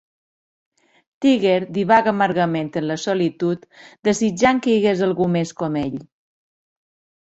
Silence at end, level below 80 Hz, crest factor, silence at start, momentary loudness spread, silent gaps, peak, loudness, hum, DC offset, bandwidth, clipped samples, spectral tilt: 1.2 s; -56 dBFS; 18 dB; 1.2 s; 8 LU; none; -2 dBFS; -19 LUFS; none; under 0.1%; 8.2 kHz; under 0.1%; -5.5 dB/octave